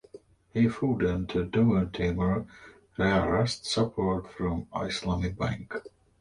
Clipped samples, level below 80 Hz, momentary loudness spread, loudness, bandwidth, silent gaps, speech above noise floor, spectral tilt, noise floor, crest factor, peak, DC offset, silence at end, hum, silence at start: under 0.1%; -44 dBFS; 10 LU; -28 LUFS; 11 kHz; none; 25 dB; -6.5 dB/octave; -52 dBFS; 16 dB; -12 dBFS; under 0.1%; 0.35 s; none; 0.15 s